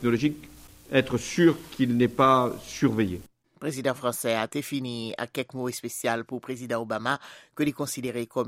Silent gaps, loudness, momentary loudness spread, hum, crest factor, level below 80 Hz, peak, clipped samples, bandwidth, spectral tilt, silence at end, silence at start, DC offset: none; -27 LUFS; 11 LU; none; 20 dB; -58 dBFS; -8 dBFS; under 0.1%; 16 kHz; -5 dB/octave; 0 s; 0 s; under 0.1%